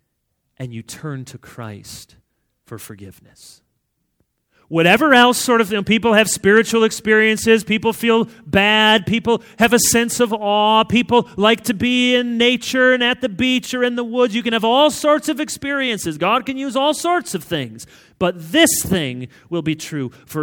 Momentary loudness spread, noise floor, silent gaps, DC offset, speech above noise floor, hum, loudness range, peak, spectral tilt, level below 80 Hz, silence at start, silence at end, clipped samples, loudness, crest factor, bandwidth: 18 LU; -71 dBFS; none; under 0.1%; 54 dB; none; 6 LU; 0 dBFS; -3.5 dB/octave; -50 dBFS; 0.6 s; 0 s; under 0.1%; -16 LUFS; 18 dB; 20 kHz